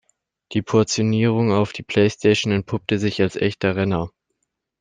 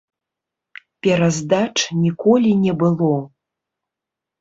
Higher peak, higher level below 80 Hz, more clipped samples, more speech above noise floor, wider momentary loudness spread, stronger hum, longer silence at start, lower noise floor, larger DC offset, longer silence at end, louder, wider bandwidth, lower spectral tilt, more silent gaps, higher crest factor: about the same, -2 dBFS vs -2 dBFS; about the same, -54 dBFS vs -58 dBFS; neither; second, 56 dB vs 68 dB; about the same, 6 LU vs 5 LU; neither; second, 0.5 s vs 1.05 s; second, -75 dBFS vs -85 dBFS; neither; second, 0.7 s vs 1.15 s; about the same, -20 LUFS vs -18 LUFS; first, 9.6 kHz vs 8 kHz; about the same, -5.5 dB/octave vs -5.5 dB/octave; neither; about the same, 18 dB vs 16 dB